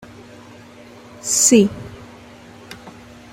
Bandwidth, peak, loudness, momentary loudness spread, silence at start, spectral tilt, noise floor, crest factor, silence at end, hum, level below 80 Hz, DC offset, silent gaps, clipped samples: 16 kHz; 0 dBFS; -15 LUFS; 27 LU; 1.25 s; -3.5 dB/octave; -42 dBFS; 22 dB; 0.4 s; none; -54 dBFS; under 0.1%; none; under 0.1%